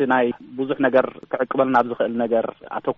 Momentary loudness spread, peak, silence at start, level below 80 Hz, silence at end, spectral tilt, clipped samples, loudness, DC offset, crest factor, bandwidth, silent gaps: 9 LU; -4 dBFS; 0 s; -66 dBFS; 0.05 s; -4 dB/octave; under 0.1%; -21 LUFS; under 0.1%; 16 dB; 6 kHz; none